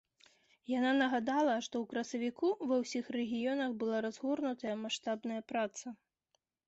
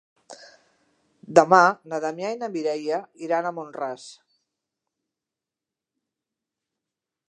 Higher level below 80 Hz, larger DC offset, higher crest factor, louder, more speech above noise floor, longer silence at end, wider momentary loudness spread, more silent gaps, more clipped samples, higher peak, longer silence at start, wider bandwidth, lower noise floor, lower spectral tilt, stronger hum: about the same, -80 dBFS vs -78 dBFS; neither; second, 16 dB vs 26 dB; second, -35 LUFS vs -23 LUFS; second, 47 dB vs 66 dB; second, 0.75 s vs 3.15 s; second, 7 LU vs 16 LU; neither; neither; second, -20 dBFS vs 0 dBFS; first, 0.7 s vs 0.3 s; second, 8 kHz vs 11 kHz; second, -82 dBFS vs -88 dBFS; second, -2.5 dB/octave vs -5 dB/octave; neither